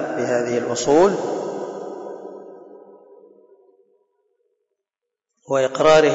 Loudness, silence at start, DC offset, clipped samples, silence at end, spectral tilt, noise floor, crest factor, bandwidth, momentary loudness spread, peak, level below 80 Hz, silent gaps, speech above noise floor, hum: -19 LUFS; 0 s; under 0.1%; under 0.1%; 0 s; -4.5 dB/octave; -84 dBFS; 18 dB; 7.8 kHz; 21 LU; -4 dBFS; -58 dBFS; none; 67 dB; none